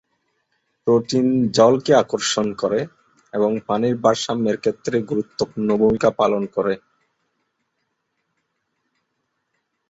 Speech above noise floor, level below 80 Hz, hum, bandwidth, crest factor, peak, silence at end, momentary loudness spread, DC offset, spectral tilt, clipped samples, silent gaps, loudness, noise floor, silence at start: 55 dB; -58 dBFS; none; 8.2 kHz; 20 dB; -2 dBFS; 3.1 s; 9 LU; under 0.1%; -5 dB/octave; under 0.1%; none; -20 LUFS; -74 dBFS; 0.85 s